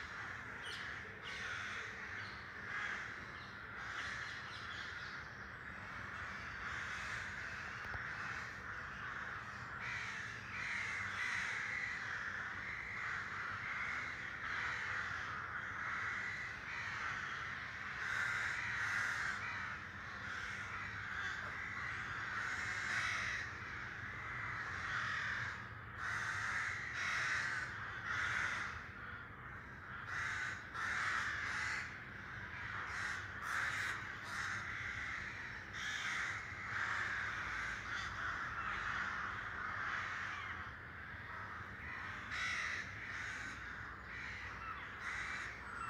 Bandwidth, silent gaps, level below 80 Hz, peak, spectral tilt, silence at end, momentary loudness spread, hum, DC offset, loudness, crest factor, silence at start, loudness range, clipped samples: 15.5 kHz; none; -62 dBFS; -26 dBFS; -2.5 dB/octave; 0 s; 9 LU; none; under 0.1%; -42 LUFS; 18 dB; 0 s; 5 LU; under 0.1%